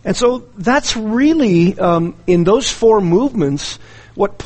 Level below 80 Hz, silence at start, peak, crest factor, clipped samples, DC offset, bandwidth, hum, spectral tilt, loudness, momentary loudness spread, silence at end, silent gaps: -38 dBFS; 0.05 s; -2 dBFS; 14 dB; under 0.1%; under 0.1%; 8.8 kHz; none; -5.5 dB/octave; -14 LUFS; 8 LU; 0 s; none